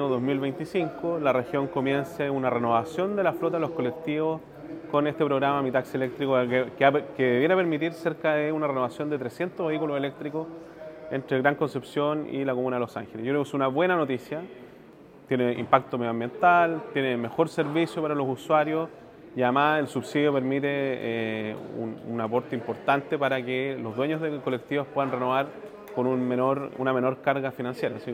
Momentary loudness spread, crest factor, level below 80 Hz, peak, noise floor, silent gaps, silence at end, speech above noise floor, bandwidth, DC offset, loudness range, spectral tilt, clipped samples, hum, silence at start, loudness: 10 LU; 24 dB; -68 dBFS; -2 dBFS; -50 dBFS; none; 0 s; 23 dB; 15.5 kHz; under 0.1%; 4 LU; -7 dB/octave; under 0.1%; none; 0 s; -27 LUFS